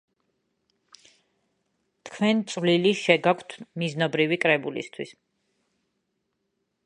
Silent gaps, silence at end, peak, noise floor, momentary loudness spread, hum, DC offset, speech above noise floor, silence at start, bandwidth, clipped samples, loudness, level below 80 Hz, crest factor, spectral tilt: none; 1.75 s; -2 dBFS; -77 dBFS; 17 LU; none; under 0.1%; 53 dB; 2.05 s; 10.5 kHz; under 0.1%; -24 LUFS; -76 dBFS; 26 dB; -5 dB/octave